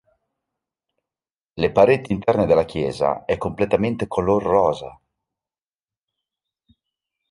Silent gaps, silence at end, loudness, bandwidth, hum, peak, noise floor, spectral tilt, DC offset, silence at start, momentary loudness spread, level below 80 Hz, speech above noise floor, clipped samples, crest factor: none; 2.4 s; -20 LUFS; 11.5 kHz; none; -2 dBFS; under -90 dBFS; -7.5 dB/octave; under 0.1%; 1.55 s; 8 LU; -48 dBFS; over 71 dB; under 0.1%; 20 dB